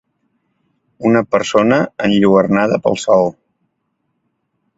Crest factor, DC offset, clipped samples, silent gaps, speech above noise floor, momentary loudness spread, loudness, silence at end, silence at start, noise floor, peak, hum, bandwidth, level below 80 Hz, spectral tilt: 16 dB; under 0.1%; under 0.1%; none; 56 dB; 4 LU; -14 LUFS; 1.45 s; 1 s; -69 dBFS; 0 dBFS; none; 8 kHz; -52 dBFS; -6 dB/octave